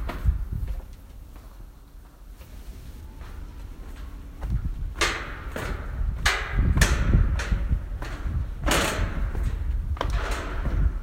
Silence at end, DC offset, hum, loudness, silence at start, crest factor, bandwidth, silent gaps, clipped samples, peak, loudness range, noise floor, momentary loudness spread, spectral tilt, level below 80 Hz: 0 s; under 0.1%; none; -27 LUFS; 0 s; 24 dB; 16 kHz; none; under 0.1%; -2 dBFS; 17 LU; -46 dBFS; 23 LU; -4.5 dB/octave; -28 dBFS